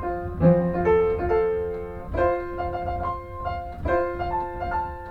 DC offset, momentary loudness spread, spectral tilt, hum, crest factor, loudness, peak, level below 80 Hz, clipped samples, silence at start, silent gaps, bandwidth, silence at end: under 0.1%; 11 LU; -10 dB/octave; none; 18 dB; -25 LUFS; -6 dBFS; -38 dBFS; under 0.1%; 0 s; none; 5 kHz; 0 s